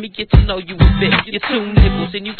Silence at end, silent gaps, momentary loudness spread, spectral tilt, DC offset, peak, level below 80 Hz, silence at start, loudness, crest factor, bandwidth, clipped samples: 0.05 s; none; 6 LU; -9.5 dB/octave; under 0.1%; 0 dBFS; -18 dBFS; 0 s; -15 LUFS; 14 dB; 4.5 kHz; 0.3%